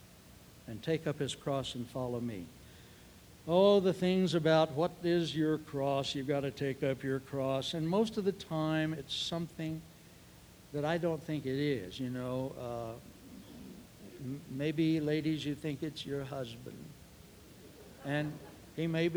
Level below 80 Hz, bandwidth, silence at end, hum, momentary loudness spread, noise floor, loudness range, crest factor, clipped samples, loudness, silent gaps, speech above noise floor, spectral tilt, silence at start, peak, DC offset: -64 dBFS; over 20 kHz; 0 s; none; 22 LU; -57 dBFS; 9 LU; 20 dB; under 0.1%; -34 LUFS; none; 23 dB; -6 dB/octave; 0.05 s; -14 dBFS; under 0.1%